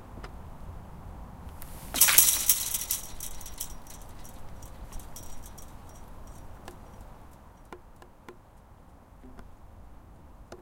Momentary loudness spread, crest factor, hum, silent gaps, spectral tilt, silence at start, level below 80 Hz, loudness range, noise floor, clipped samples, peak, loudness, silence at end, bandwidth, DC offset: 29 LU; 32 dB; none; none; 0 dB/octave; 0 s; -48 dBFS; 24 LU; -53 dBFS; under 0.1%; 0 dBFS; -23 LUFS; 0 s; 17 kHz; under 0.1%